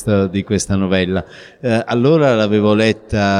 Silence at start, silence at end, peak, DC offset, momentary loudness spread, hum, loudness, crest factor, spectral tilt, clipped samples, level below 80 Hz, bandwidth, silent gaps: 0 s; 0 s; -2 dBFS; under 0.1%; 7 LU; none; -15 LUFS; 12 dB; -6 dB/octave; under 0.1%; -42 dBFS; 12 kHz; none